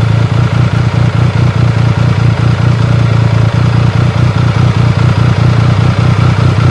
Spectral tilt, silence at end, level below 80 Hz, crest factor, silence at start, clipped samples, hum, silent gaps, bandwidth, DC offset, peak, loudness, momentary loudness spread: -7.5 dB/octave; 0 s; -26 dBFS; 8 dB; 0 s; 0.4%; none; none; 8.4 kHz; under 0.1%; 0 dBFS; -9 LUFS; 1 LU